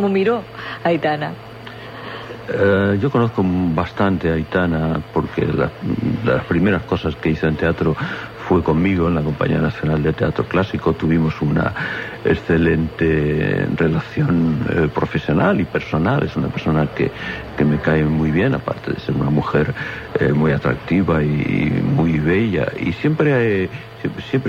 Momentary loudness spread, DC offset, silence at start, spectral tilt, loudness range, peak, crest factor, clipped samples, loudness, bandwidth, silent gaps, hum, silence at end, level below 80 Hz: 8 LU; under 0.1%; 0 s; -8.5 dB/octave; 2 LU; -4 dBFS; 14 dB; under 0.1%; -19 LUFS; 7 kHz; none; none; 0 s; -38 dBFS